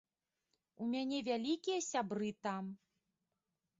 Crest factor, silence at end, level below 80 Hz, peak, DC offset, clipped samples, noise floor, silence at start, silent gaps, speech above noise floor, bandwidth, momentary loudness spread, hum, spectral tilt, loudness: 16 dB; 1.05 s; -84 dBFS; -26 dBFS; under 0.1%; under 0.1%; -89 dBFS; 0.8 s; none; 50 dB; 7.6 kHz; 8 LU; none; -4 dB/octave; -40 LUFS